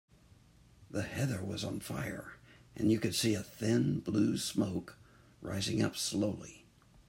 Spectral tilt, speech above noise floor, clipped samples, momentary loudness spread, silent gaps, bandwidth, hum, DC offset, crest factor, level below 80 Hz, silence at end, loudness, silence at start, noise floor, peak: -5 dB/octave; 28 dB; under 0.1%; 15 LU; none; 16 kHz; none; under 0.1%; 18 dB; -64 dBFS; 0.5 s; -34 LUFS; 0.8 s; -62 dBFS; -18 dBFS